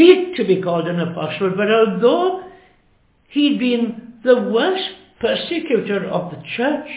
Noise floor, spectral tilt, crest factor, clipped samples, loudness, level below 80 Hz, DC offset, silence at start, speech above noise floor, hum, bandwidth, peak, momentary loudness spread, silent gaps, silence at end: -57 dBFS; -10 dB/octave; 18 dB; under 0.1%; -18 LUFS; -60 dBFS; under 0.1%; 0 s; 39 dB; none; 4 kHz; 0 dBFS; 9 LU; none; 0 s